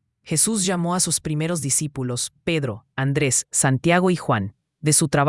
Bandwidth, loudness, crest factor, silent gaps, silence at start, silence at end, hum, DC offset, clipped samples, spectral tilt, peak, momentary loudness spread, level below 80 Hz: 12 kHz; -21 LUFS; 20 dB; none; 0.25 s; 0 s; none; under 0.1%; under 0.1%; -4 dB/octave; -2 dBFS; 8 LU; -54 dBFS